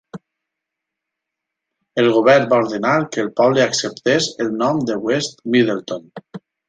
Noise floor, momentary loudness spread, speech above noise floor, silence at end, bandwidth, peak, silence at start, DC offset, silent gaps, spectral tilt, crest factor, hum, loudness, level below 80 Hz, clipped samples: -82 dBFS; 13 LU; 65 dB; 0.3 s; 9.4 kHz; -2 dBFS; 0.15 s; under 0.1%; none; -4.5 dB/octave; 18 dB; none; -17 LUFS; -62 dBFS; under 0.1%